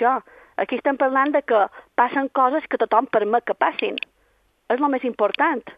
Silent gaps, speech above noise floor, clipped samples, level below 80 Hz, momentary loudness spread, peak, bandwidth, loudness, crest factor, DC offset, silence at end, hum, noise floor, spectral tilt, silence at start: none; 42 dB; under 0.1%; -68 dBFS; 8 LU; -4 dBFS; 5.2 kHz; -21 LUFS; 18 dB; under 0.1%; 0.05 s; none; -63 dBFS; -6.5 dB/octave; 0 s